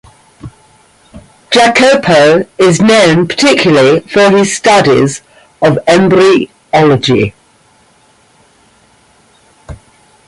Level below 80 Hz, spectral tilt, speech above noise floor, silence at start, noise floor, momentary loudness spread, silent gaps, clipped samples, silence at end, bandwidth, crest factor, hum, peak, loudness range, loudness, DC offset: -44 dBFS; -4.5 dB/octave; 40 dB; 0.45 s; -47 dBFS; 6 LU; none; under 0.1%; 0.55 s; 11.5 kHz; 10 dB; none; 0 dBFS; 8 LU; -8 LUFS; under 0.1%